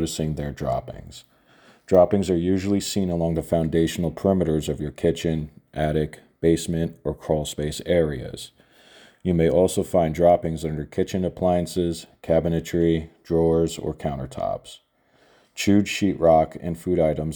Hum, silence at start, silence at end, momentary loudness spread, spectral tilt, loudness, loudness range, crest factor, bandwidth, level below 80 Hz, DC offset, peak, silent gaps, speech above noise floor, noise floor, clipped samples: none; 0 s; 0 s; 11 LU; -6.5 dB/octave; -23 LUFS; 3 LU; 20 dB; over 20 kHz; -42 dBFS; under 0.1%; -2 dBFS; none; 38 dB; -60 dBFS; under 0.1%